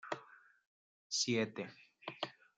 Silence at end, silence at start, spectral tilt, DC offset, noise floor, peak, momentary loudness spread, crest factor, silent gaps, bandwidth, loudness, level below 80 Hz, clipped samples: 0.25 s; 0.05 s; -3 dB/octave; under 0.1%; -61 dBFS; -22 dBFS; 16 LU; 20 dB; 0.67-1.10 s; 10 kHz; -39 LUFS; -88 dBFS; under 0.1%